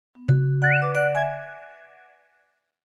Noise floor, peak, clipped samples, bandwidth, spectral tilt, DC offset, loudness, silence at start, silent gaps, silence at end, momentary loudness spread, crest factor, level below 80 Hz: -68 dBFS; -8 dBFS; under 0.1%; 10.5 kHz; -8 dB/octave; under 0.1%; -22 LUFS; 0.2 s; none; 1.15 s; 18 LU; 16 dB; -58 dBFS